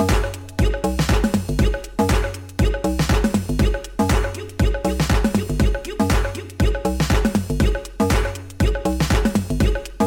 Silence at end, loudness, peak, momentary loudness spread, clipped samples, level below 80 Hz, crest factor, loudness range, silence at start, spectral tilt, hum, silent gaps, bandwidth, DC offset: 0 s; -21 LUFS; -4 dBFS; 4 LU; under 0.1%; -24 dBFS; 14 dB; 1 LU; 0 s; -6 dB/octave; none; none; 17 kHz; under 0.1%